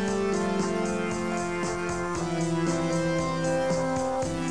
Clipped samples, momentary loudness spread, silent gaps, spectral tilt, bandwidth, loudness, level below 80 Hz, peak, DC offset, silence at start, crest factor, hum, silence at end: under 0.1%; 3 LU; none; -5.5 dB/octave; 10.5 kHz; -28 LUFS; -50 dBFS; -14 dBFS; 0.5%; 0 s; 14 dB; none; 0 s